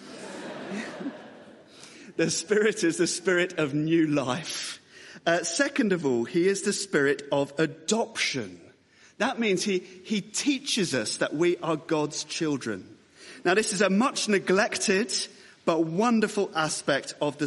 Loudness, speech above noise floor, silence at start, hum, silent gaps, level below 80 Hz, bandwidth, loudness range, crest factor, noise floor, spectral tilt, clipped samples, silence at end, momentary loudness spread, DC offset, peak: -26 LUFS; 31 dB; 0 s; none; none; -72 dBFS; 11.5 kHz; 3 LU; 18 dB; -57 dBFS; -3.5 dB/octave; under 0.1%; 0 s; 12 LU; under 0.1%; -8 dBFS